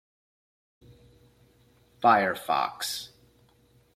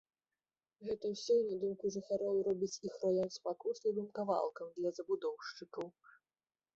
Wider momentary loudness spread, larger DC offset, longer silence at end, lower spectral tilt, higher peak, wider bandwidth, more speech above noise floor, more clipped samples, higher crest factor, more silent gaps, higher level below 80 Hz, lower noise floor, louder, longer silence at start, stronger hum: about the same, 13 LU vs 13 LU; neither; about the same, 0.9 s vs 0.85 s; second, -3 dB/octave vs -5 dB/octave; first, -8 dBFS vs -22 dBFS; first, 16 kHz vs 7.8 kHz; second, 37 dB vs over 52 dB; neither; first, 24 dB vs 18 dB; neither; first, -68 dBFS vs -80 dBFS; second, -63 dBFS vs under -90 dBFS; first, -26 LUFS vs -38 LUFS; first, 2 s vs 0.8 s; neither